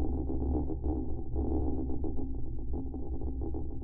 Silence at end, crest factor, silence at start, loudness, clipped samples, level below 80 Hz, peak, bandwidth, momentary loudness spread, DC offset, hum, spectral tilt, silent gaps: 0 s; 12 dB; 0 s; -36 LUFS; under 0.1%; -36 dBFS; -20 dBFS; 1.3 kHz; 6 LU; under 0.1%; none; -13.5 dB/octave; none